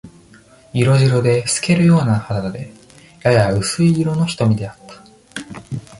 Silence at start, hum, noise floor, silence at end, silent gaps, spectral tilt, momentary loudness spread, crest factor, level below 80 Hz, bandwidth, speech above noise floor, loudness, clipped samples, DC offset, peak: 0.05 s; none; -46 dBFS; 0.05 s; none; -6 dB/octave; 18 LU; 16 dB; -46 dBFS; 11.5 kHz; 31 dB; -16 LUFS; under 0.1%; under 0.1%; -2 dBFS